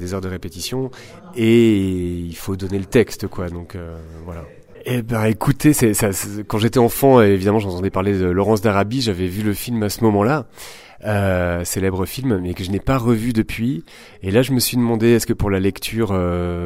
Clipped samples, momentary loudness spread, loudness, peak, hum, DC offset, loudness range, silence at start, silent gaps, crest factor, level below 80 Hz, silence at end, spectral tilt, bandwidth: under 0.1%; 15 LU; -18 LUFS; 0 dBFS; none; under 0.1%; 4 LU; 0 s; none; 18 dB; -40 dBFS; 0 s; -6 dB/octave; 16 kHz